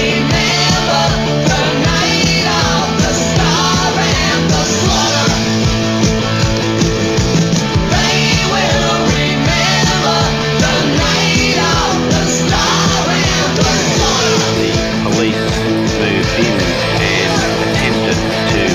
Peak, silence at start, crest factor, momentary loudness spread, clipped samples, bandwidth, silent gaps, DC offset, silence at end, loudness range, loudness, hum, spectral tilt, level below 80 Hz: 0 dBFS; 0 s; 12 dB; 3 LU; under 0.1%; 16 kHz; none; under 0.1%; 0 s; 1 LU; -12 LUFS; none; -4 dB/octave; -28 dBFS